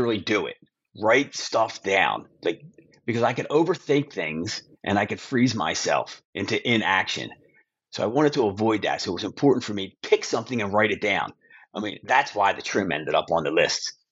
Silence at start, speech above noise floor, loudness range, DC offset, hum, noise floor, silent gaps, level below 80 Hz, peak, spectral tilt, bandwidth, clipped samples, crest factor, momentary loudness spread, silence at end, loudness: 0 s; 38 dB; 1 LU; under 0.1%; none; -62 dBFS; 6.25-6.33 s; -66 dBFS; -4 dBFS; -4.5 dB/octave; 8 kHz; under 0.1%; 20 dB; 10 LU; 0.2 s; -24 LUFS